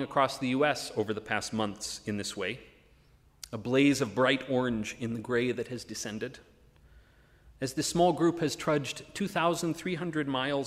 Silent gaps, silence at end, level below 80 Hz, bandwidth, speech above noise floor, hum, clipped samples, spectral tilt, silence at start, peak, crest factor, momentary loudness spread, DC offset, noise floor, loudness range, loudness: none; 0 s; -62 dBFS; 15.5 kHz; 31 dB; none; under 0.1%; -4.5 dB/octave; 0 s; -10 dBFS; 20 dB; 11 LU; under 0.1%; -62 dBFS; 4 LU; -30 LUFS